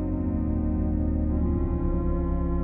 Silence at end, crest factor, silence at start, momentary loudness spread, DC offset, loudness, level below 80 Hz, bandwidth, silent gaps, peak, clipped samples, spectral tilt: 0 s; 10 dB; 0 s; 1 LU; under 0.1%; -27 LUFS; -28 dBFS; 2.6 kHz; none; -14 dBFS; under 0.1%; -14 dB/octave